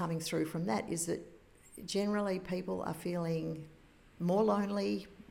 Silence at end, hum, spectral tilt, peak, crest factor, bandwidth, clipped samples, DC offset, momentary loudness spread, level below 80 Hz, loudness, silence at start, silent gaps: 0.05 s; none; -5.5 dB/octave; -20 dBFS; 16 dB; 17 kHz; under 0.1%; under 0.1%; 13 LU; -64 dBFS; -35 LUFS; 0 s; none